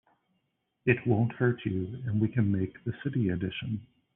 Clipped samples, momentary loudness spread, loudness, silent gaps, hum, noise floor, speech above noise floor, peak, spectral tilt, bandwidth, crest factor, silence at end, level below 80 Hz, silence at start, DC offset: under 0.1%; 9 LU; -30 LUFS; none; none; -78 dBFS; 49 dB; -10 dBFS; -7.5 dB/octave; 3.8 kHz; 20 dB; 0.3 s; -62 dBFS; 0.85 s; under 0.1%